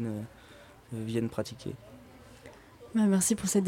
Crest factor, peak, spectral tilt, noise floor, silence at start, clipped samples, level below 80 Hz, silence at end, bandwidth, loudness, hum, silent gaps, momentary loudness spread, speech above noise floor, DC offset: 18 dB; -14 dBFS; -5 dB/octave; -53 dBFS; 0 s; under 0.1%; -60 dBFS; 0 s; 16.5 kHz; -30 LUFS; none; none; 26 LU; 24 dB; under 0.1%